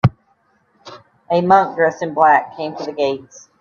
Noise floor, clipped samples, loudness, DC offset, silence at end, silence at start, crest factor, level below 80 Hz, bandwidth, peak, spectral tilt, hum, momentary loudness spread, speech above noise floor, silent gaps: -60 dBFS; under 0.1%; -16 LUFS; under 0.1%; 0.4 s; 0.05 s; 18 dB; -52 dBFS; 7 kHz; 0 dBFS; -7 dB/octave; none; 13 LU; 44 dB; none